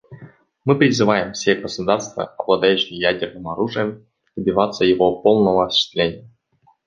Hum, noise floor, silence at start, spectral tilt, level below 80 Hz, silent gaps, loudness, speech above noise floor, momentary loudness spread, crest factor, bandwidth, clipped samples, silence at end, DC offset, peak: none; -60 dBFS; 0.1 s; -5 dB/octave; -52 dBFS; none; -19 LUFS; 42 dB; 11 LU; 18 dB; 9 kHz; under 0.1%; 0.6 s; under 0.1%; 0 dBFS